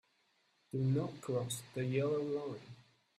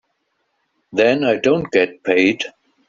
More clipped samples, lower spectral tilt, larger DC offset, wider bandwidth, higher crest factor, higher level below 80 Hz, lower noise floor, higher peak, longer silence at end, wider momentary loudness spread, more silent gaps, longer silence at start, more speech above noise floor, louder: neither; first, -6.5 dB/octave vs -3.5 dB/octave; neither; first, 14.5 kHz vs 7.6 kHz; about the same, 16 dB vs 16 dB; second, -74 dBFS vs -58 dBFS; first, -76 dBFS vs -69 dBFS; second, -22 dBFS vs -2 dBFS; about the same, 0.4 s vs 0.4 s; about the same, 11 LU vs 10 LU; neither; second, 0.75 s vs 0.95 s; second, 39 dB vs 53 dB; second, -38 LUFS vs -17 LUFS